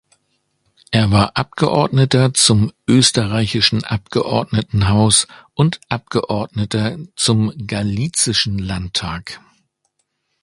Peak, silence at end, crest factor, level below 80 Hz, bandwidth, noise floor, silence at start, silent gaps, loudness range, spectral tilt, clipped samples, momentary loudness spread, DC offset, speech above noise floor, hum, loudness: 0 dBFS; 1.05 s; 18 dB; -38 dBFS; 11.5 kHz; -70 dBFS; 0.9 s; none; 5 LU; -4.5 dB/octave; under 0.1%; 10 LU; under 0.1%; 53 dB; none; -16 LUFS